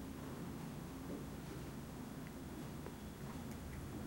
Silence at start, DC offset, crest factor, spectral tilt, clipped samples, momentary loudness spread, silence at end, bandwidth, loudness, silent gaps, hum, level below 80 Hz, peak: 0 s; under 0.1%; 14 dB; -6 dB/octave; under 0.1%; 2 LU; 0 s; 16 kHz; -49 LUFS; none; none; -58 dBFS; -34 dBFS